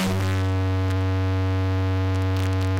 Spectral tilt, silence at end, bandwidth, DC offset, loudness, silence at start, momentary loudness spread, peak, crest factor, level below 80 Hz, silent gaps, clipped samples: -7 dB/octave; 0 s; 12.5 kHz; 0.1%; -24 LUFS; 0 s; 0 LU; -18 dBFS; 4 dB; -46 dBFS; none; under 0.1%